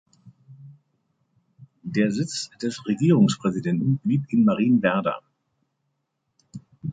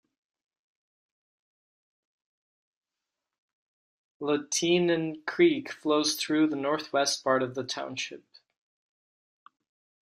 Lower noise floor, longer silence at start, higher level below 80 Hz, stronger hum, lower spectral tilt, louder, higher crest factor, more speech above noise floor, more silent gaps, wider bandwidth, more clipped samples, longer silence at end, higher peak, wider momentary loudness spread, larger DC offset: second, -76 dBFS vs -89 dBFS; second, 0.25 s vs 4.2 s; first, -64 dBFS vs -78 dBFS; neither; first, -6.5 dB/octave vs -3.5 dB/octave; first, -22 LUFS vs -27 LUFS; about the same, 20 dB vs 20 dB; second, 55 dB vs 61 dB; neither; second, 9.4 kHz vs 14 kHz; neither; second, 0 s vs 1.9 s; first, -6 dBFS vs -10 dBFS; first, 17 LU vs 9 LU; neither